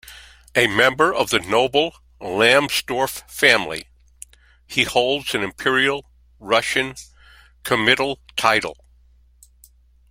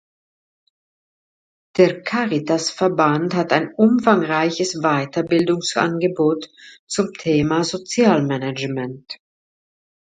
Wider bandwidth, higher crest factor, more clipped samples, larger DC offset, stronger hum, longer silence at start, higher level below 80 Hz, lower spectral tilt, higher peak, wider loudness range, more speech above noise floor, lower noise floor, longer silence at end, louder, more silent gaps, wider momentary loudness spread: first, 16.5 kHz vs 9.4 kHz; about the same, 22 dB vs 20 dB; neither; neither; neither; second, 0.05 s vs 1.75 s; first, -52 dBFS vs -58 dBFS; second, -3 dB/octave vs -5 dB/octave; about the same, 0 dBFS vs 0 dBFS; about the same, 4 LU vs 3 LU; second, 34 dB vs over 71 dB; second, -53 dBFS vs under -90 dBFS; first, 1.4 s vs 1 s; about the same, -19 LUFS vs -19 LUFS; second, none vs 6.79-6.87 s; first, 13 LU vs 10 LU